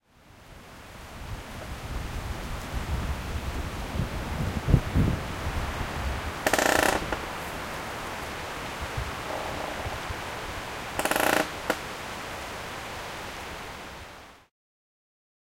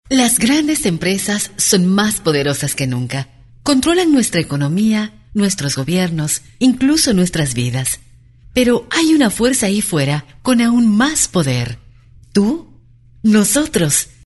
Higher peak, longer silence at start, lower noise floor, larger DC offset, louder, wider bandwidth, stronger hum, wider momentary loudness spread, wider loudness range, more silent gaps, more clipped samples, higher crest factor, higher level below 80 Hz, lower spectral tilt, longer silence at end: second, -4 dBFS vs 0 dBFS; first, 0.25 s vs 0.05 s; first, -53 dBFS vs -45 dBFS; neither; second, -30 LUFS vs -15 LUFS; first, 16.5 kHz vs 12 kHz; neither; first, 16 LU vs 8 LU; first, 9 LU vs 2 LU; neither; neither; first, 26 dB vs 16 dB; about the same, -38 dBFS vs -42 dBFS; about the same, -4.5 dB/octave vs -4 dB/octave; first, 1.1 s vs 0.2 s